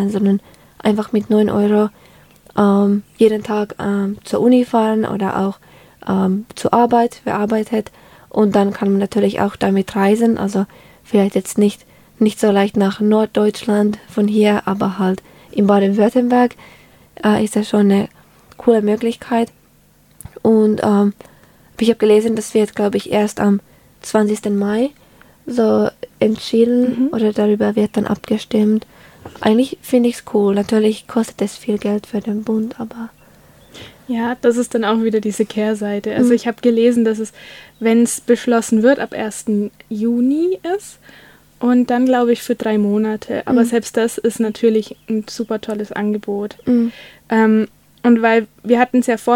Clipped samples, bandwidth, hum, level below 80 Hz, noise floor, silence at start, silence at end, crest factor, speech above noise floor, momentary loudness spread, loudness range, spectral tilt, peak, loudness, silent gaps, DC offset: under 0.1%; 16 kHz; none; -54 dBFS; -52 dBFS; 0 s; 0 s; 16 dB; 36 dB; 9 LU; 3 LU; -6 dB/octave; 0 dBFS; -17 LUFS; none; under 0.1%